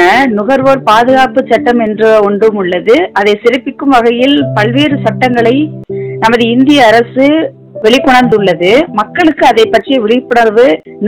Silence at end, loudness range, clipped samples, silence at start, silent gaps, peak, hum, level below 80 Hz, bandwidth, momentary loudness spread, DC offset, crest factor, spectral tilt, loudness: 0 s; 2 LU; 5%; 0 s; none; 0 dBFS; none; -42 dBFS; 16.5 kHz; 6 LU; 0.4%; 8 dB; -5.5 dB/octave; -8 LUFS